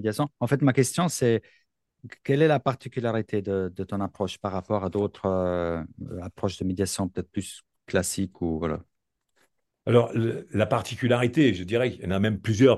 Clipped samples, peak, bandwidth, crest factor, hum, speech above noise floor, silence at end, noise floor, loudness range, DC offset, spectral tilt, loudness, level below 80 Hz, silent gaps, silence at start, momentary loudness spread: under 0.1%; -6 dBFS; 12.5 kHz; 20 dB; none; 49 dB; 0 s; -75 dBFS; 5 LU; under 0.1%; -6 dB/octave; -26 LUFS; -54 dBFS; none; 0 s; 11 LU